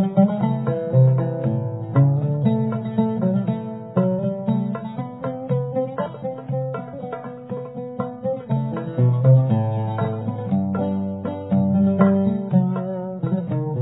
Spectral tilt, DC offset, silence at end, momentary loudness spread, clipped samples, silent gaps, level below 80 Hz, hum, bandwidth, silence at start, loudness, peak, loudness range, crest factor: -13.5 dB/octave; under 0.1%; 0 s; 12 LU; under 0.1%; none; -60 dBFS; none; 4 kHz; 0 s; -22 LUFS; -2 dBFS; 7 LU; 20 dB